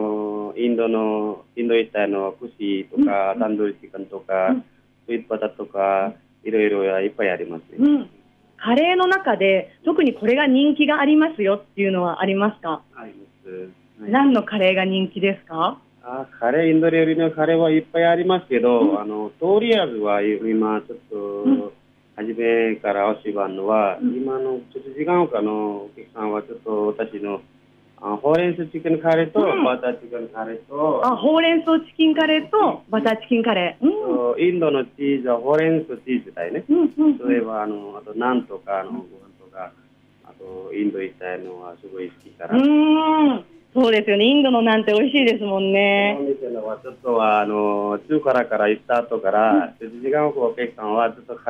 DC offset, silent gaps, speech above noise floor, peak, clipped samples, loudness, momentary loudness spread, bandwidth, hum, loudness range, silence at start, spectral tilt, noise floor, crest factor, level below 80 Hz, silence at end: under 0.1%; none; 32 dB; -6 dBFS; under 0.1%; -20 LUFS; 14 LU; 5.8 kHz; 50 Hz at -55 dBFS; 6 LU; 0 s; -7.5 dB/octave; -52 dBFS; 14 dB; -66 dBFS; 0 s